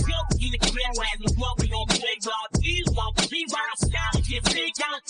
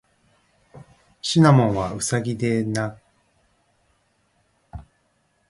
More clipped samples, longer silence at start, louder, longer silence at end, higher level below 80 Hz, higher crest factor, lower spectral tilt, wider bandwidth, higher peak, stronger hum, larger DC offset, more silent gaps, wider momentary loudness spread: neither; second, 0 s vs 0.75 s; second, -25 LUFS vs -21 LUFS; second, 0.1 s vs 0.7 s; first, -30 dBFS vs -52 dBFS; about the same, 20 dB vs 22 dB; second, -3.5 dB/octave vs -5.5 dB/octave; second, 10 kHz vs 11.5 kHz; second, -6 dBFS vs -2 dBFS; neither; neither; neither; second, 3 LU vs 27 LU